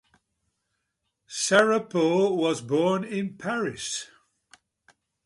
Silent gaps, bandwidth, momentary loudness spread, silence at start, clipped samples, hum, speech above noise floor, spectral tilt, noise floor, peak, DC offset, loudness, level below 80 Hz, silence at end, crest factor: none; 11.5 kHz; 11 LU; 1.3 s; under 0.1%; none; 55 dB; -4 dB/octave; -79 dBFS; -6 dBFS; under 0.1%; -25 LUFS; -70 dBFS; 1.2 s; 22 dB